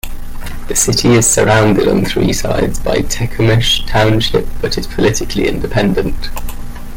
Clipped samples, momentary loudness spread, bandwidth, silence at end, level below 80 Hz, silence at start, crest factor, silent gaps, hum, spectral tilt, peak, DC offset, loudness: under 0.1%; 17 LU; 17 kHz; 0 s; -22 dBFS; 0.05 s; 12 dB; none; none; -4 dB/octave; 0 dBFS; under 0.1%; -13 LUFS